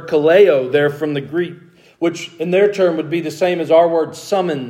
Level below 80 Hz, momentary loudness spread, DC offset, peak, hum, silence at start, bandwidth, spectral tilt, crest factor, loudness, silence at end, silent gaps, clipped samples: -68 dBFS; 11 LU; under 0.1%; 0 dBFS; none; 0 s; 15 kHz; -6 dB/octave; 16 dB; -16 LUFS; 0 s; none; under 0.1%